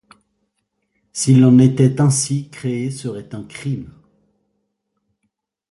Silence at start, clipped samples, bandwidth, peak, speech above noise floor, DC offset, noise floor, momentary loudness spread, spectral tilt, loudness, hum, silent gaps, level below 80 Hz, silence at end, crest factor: 1.15 s; under 0.1%; 11.5 kHz; -2 dBFS; 58 dB; under 0.1%; -73 dBFS; 18 LU; -6.5 dB/octave; -16 LUFS; none; none; -54 dBFS; 1.8 s; 16 dB